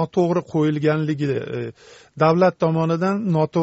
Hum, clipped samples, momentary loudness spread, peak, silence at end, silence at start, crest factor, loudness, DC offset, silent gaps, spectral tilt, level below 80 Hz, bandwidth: none; under 0.1%; 9 LU; -4 dBFS; 0 s; 0 s; 16 dB; -20 LUFS; under 0.1%; none; -7 dB/octave; -60 dBFS; 8 kHz